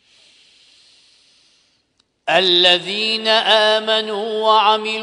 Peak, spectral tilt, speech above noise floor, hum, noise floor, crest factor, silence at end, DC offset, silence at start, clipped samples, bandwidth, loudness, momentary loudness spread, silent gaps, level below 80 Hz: 0 dBFS; -2.5 dB/octave; 49 dB; none; -64 dBFS; 18 dB; 0 s; under 0.1%; 2.25 s; under 0.1%; 10.5 kHz; -14 LUFS; 7 LU; none; -68 dBFS